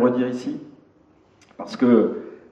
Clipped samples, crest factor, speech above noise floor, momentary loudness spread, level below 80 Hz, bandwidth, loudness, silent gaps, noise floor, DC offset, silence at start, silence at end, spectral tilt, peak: under 0.1%; 20 dB; 36 dB; 19 LU; -72 dBFS; 8 kHz; -21 LUFS; none; -56 dBFS; under 0.1%; 0 s; 0.15 s; -7.5 dB/octave; -4 dBFS